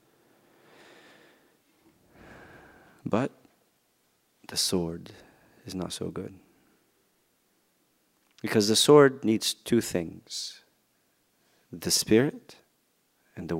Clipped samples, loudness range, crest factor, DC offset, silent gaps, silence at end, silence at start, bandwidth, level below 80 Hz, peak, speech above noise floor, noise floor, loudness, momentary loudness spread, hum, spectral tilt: under 0.1%; 14 LU; 26 dB; under 0.1%; none; 0 s; 3.05 s; 16 kHz; -64 dBFS; -4 dBFS; 45 dB; -71 dBFS; -26 LUFS; 24 LU; none; -4 dB/octave